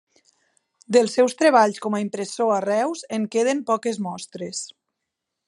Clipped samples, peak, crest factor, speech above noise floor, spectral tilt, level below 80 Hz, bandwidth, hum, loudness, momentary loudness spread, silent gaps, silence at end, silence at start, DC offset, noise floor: under 0.1%; -4 dBFS; 20 dB; 60 dB; -4 dB/octave; -80 dBFS; 11.5 kHz; none; -22 LUFS; 14 LU; none; 0.8 s; 0.9 s; under 0.1%; -82 dBFS